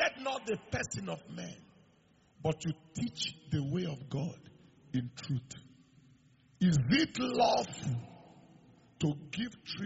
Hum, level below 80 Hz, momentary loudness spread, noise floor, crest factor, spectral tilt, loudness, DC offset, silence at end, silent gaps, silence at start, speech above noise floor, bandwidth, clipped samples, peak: none; -64 dBFS; 15 LU; -67 dBFS; 20 dB; -5 dB/octave; -35 LUFS; under 0.1%; 0 s; none; 0 s; 33 dB; 8 kHz; under 0.1%; -16 dBFS